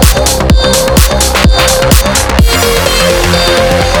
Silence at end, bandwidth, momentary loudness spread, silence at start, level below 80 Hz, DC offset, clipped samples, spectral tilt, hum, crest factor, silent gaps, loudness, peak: 0 s; over 20 kHz; 1 LU; 0 s; -12 dBFS; under 0.1%; 0.6%; -3.5 dB/octave; none; 8 dB; none; -7 LUFS; 0 dBFS